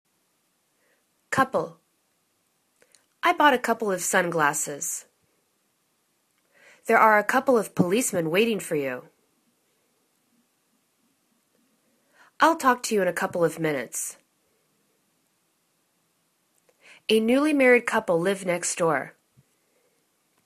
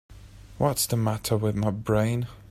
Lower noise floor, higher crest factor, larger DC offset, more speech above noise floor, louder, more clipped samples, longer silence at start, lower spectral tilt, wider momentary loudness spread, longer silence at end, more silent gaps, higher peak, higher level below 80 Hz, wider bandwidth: first, -71 dBFS vs -46 dBFS; about the same, 22 dB vs 18 dB; neither; first, 48 dB vs 21 dB; first, -23 LUFS vs -26 LUFS; neither; first, 1.3 s vs 0.1 s; second, -3.5 dB/octave vs -5.5 dB/octave; first, 12 LU vs 3 LU; first, 1.35 s vs 0.15 s; neither; first, -4 dBFS vs -10 dBFS; second, -72 dBFS vs -48 dBFS; second, 14 kHz vs 15.5 kHz